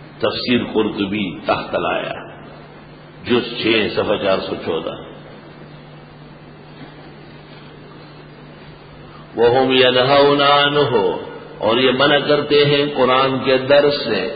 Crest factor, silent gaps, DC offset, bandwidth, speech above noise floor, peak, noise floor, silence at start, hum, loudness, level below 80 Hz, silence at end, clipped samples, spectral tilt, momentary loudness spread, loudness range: 18 dB; none; under 0.1%; 5 kHz; 24 dB; 0 dBFS; -39 dBFS; 0 s; none; -16 LUFS; -50 dBFS; 0 s; under 0.1%; -10.5 dB/octave; 20 LU; 12 LU